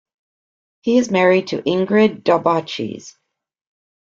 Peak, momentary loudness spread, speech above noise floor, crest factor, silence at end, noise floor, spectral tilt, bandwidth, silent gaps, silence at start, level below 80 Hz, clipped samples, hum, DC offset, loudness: -2 dBFS; 12 LU; over 73 dB; 18 dB; 0.95 s; under -90 dBFS; -5.5 dB/octave; 7.6 kHz; none; 0.85 s; -62 dBFS; under 0.1%; none; under 0.1%; -17 LUFS